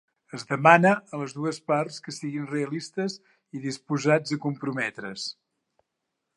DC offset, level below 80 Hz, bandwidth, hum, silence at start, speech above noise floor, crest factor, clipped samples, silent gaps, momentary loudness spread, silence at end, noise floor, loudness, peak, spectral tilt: under 0.1%; -76 dBFS; 11.5 kHz; none; 0.35 s; 56 dB; 24 dB; under 0.1%; none; 17 LU; 1.05 s; -82 dBFS; -26 LUFS; -4 dBFS; -5.5 dB/octave